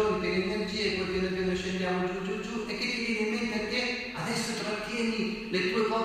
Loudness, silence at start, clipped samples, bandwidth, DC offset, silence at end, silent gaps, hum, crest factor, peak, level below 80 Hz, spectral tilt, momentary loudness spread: -30 LUFS; 0 s; under 0.1%; 15.5 kHz; under 0.1%; 0 s; none; none; 14 dB; -16 dBFS; -52 dBFS; -4.5 dB/octave; 4 LU